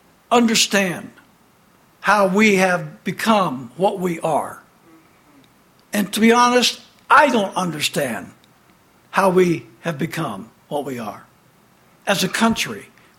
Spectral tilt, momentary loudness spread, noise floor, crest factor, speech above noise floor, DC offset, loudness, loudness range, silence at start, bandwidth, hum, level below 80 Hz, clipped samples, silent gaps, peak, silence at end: -4 dB/octave; 15 LU; -54 dBFS; 20 dB; 36 dB; under 0.1%; -18 LUFS; 6 LU; 0.3 s; 17 kHz; none; -60 dBFS; under 0.1%; none; 0 dBFS; 0.35 s